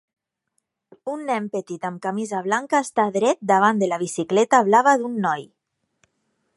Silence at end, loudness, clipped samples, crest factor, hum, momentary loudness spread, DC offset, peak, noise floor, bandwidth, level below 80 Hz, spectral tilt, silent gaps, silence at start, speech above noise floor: 1.1 s; -21 LUFS; under 0.1%; 20 dB; none; 13 LU; under 0.1%; -4 dBFS; -75 dBFS; 11.5 kHz; -76 dBFS; -4.5 dB/octave; none; 1.05 s; 55 dB